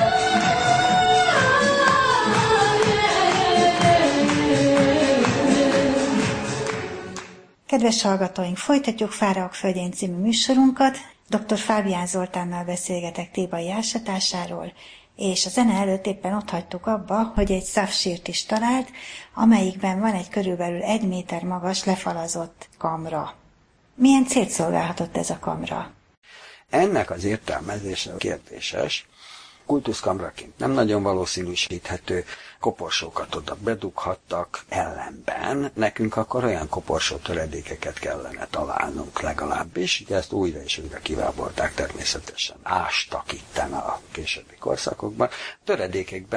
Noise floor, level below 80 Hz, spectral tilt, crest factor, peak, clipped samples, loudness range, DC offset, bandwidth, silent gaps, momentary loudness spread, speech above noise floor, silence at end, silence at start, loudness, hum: -58 dBFS; -46 dBFS; -4 dB/octave; 20 dB; -2 dBFS; under 0.1%; 9 LU; under 0.1%; 10.5 kHz; 26.17-26.22 s; 12 LU; 34 dB; 0 s; 0 s; -23 LUFS; none